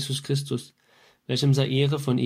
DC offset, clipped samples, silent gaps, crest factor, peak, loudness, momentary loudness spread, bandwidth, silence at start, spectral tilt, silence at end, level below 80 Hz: under 0.1%; under 0.1%; none; 16 dB; -8 dBFS; -25 LUFS; 11 LU; 15.5 kHz; 0 s; -6 dB/octave; 0 s; -62 dBFS